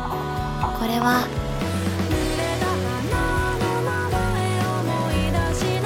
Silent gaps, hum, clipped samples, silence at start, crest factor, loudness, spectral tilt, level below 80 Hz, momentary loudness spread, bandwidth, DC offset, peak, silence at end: none; none; under 0.1%; 0 s; 16 dB; -23 LUFS; -5.5 dB/octave; -32 dBFS; 4 LU; 17 kHz; under 0.1%; -6 dBFS; 0 s